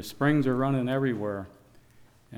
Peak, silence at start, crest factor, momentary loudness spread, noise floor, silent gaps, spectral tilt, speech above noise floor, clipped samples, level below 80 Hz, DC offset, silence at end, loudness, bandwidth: -12 dBFS; 0 s; 16 dB; 12 LU; -57 dBFS; none; -7.5 dB/octave; 30 dB; under 0.1%; -60 dBFS; under 0.1%; 0 s; -27 LUFS; 16.5 kHz